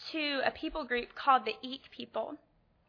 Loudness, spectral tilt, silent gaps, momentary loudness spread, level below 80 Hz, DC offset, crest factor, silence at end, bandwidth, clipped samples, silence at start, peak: -33 LUFS; -4.5 dB/octave; none; 15 LU; -62 dBFS; under 0.1%; 22 dB; 0.5 s; 5.4 kHz; under 0.1%; 0 s; -12 dBFS